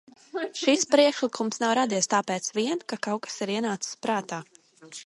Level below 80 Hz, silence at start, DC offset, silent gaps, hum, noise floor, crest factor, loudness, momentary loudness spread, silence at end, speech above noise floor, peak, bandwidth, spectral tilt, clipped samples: -78 dBFS; 0.35 s; under 0.1%; none; none; -47 dBFS; 20 dB; -26 LUFS; 13 LU; 0 s; 21 dB; -8 dBFS; 11.5 kHz; -3 dB/octave; under 0.1%